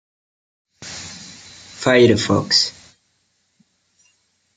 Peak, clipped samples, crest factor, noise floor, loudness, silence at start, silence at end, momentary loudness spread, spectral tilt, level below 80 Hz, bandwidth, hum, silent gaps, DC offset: -2 dBFS; under 0.1%; 20 dB; -66 dBFS; -16 LUFS; 0.8 s; 1.85 s; 25 LU; -4 dB/octave; -60 dBFS; 9.6 kHz; none; none; under 0.1%